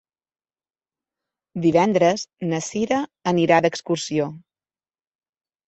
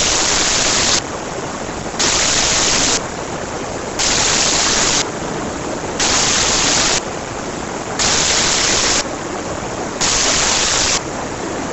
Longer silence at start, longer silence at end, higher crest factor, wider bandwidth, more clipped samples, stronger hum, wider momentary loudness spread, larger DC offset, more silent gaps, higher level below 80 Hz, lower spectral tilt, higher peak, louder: first, 1.55 s vs 0 s; first, 1.3 s vs 0 s; about the same, 20 dB vs 16 dB; second, 8.2 kHz vs over 20 kHz; neither; neither; second, 9 LU vs 12 LU; neither; neither; second, -62 dBFS vs -36 dBFS; first, -5.5 dB/octave vs -1 dB/octave; second, -4 dBFS vs 0 dBFS; second, -21 LUFS vs -15 LUFS